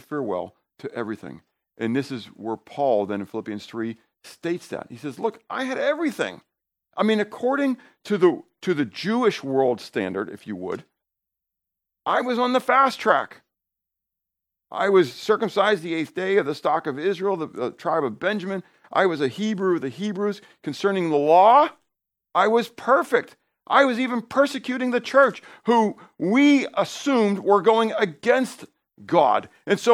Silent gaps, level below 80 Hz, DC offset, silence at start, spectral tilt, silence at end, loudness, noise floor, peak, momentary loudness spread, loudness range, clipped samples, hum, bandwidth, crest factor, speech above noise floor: none; -76 dBFS; under 0.1%; 0.1 s; -5.5 dB/octave; 0 s; -22 LUFS; -85 dBFS; -2 dBFS; 14 LU; 8 LU; under 0.1%; none; 15.5 kHz; 20 dB; 63 dB